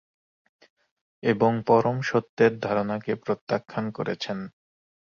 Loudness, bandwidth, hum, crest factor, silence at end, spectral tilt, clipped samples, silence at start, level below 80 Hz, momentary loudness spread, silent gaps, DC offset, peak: -25 LUFS; 7 kHz; none; 20 dB; 0.55 s; -7 dB/octave; under 0.1%; 1.25 s; -64 dBFS; 10 LU; 2.29-2.37 s, 3.41-3.47 s; under 0.1%; -6 dBFS